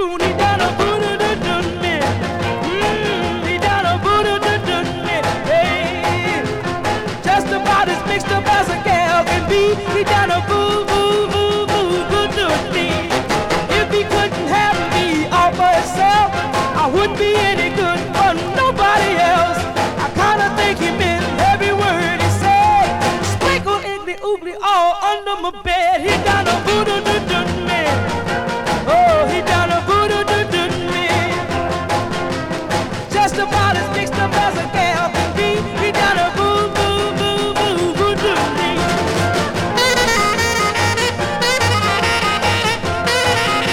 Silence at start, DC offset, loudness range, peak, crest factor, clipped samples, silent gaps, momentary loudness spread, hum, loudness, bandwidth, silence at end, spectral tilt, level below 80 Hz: 0 s; under 0.1%; 2 LU; -4 dBFS; 12 dB; under 0.1%; none; 5 LU; none; -16 LUFS; 17.5 kHz; 0 s; -4 dB/octave; -38 dBFS